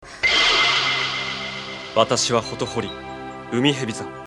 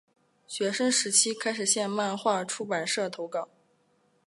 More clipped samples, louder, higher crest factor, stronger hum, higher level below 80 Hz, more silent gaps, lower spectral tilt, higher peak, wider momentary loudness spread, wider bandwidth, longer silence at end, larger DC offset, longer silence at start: neither; first, -20 LUFS vs -27 LUFS; about the same, 20 dB vs 22 dB; neither; first, -50 dBFS vs -84 dBFS; neither; about the same, -2.5 dB/octave vs -1.5 dB/octave; first, -2 dBFS vs -8 dBFS; first, 16 LU vs 12 LU; about the same, 12 kHz vs 11.5 kHz; second, 0 s vs 0.8 s; neither; second, 0 s vs 0.5 s